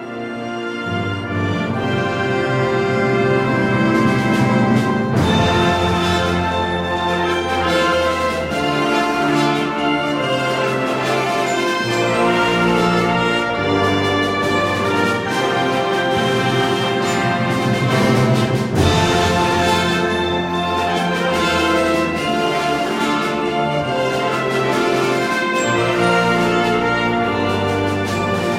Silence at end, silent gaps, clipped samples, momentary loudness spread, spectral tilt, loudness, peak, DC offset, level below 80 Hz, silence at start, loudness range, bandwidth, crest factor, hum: 0 s; none; under 0.1%; 4 LU; -5.5 dB/octave; -17 LUFS; -2 dBFS; under 0.1%; -42 dBFS; 0 s; 2 LU; 16.5 kHz; 14 dB; none